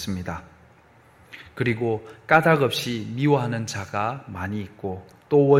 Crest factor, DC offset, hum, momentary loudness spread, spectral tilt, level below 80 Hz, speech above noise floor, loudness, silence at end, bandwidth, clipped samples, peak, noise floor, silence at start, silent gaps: 22 dB; under 0.1%; none; 17 LU; -6 dB/octave; -56 dBFS; 31 dB; -24 LUFS; 0 s; 16 kHz; under 0.1%; -2 dBFS; -54 dBFS; 0 s; none